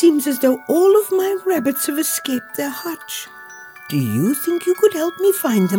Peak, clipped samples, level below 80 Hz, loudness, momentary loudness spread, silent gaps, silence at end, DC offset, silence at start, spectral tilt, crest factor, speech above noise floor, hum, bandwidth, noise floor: -2 dBFS; under 0.1%; -80 dBFS; -18 LUFS; 13 LU; none; 0 s; under 0.1%; 0 s; -5 dB/octave; 14 dB; 21 dB; none; over 20 kHz; -38 dBFS